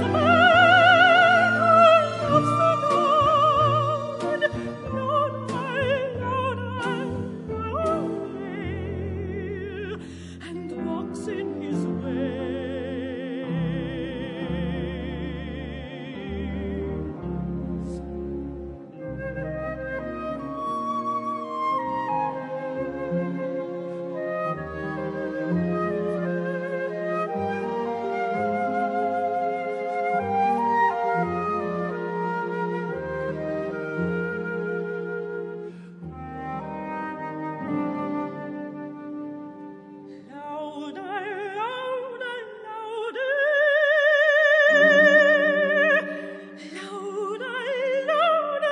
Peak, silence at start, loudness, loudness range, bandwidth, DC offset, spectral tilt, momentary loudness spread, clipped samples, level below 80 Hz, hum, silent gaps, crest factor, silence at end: -4 dBFS; 0 s; -24 LUFS; 14 LU; 10.5 kHz; under 0.1%; -6 dB/octave; 17 LU; under 0.1%; -50 dBFS; none; none; 20 dB; 0 s